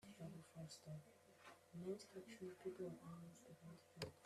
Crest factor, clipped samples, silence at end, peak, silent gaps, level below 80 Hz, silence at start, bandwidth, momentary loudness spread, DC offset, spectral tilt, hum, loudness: 22 dB; under 0.1%; 0 s; -34 dBFS; none; -84 dBFS; 0 s; 14.5 kHz; 11 LU; under 0.1%; -5.5 dB/octave; none; -57 LUFS